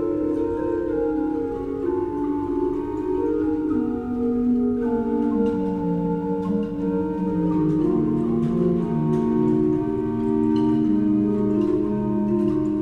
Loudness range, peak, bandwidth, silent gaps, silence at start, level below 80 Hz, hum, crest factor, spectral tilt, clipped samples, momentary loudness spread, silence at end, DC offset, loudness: 3 LU; -10 dBFS; 4.5 kHz; none; 0 s; -44 dBFS; none; 12 dB; -10.5 dB/octave; under 0.1%; 5 LU; 0 s; under 0.1%; -23 LUFS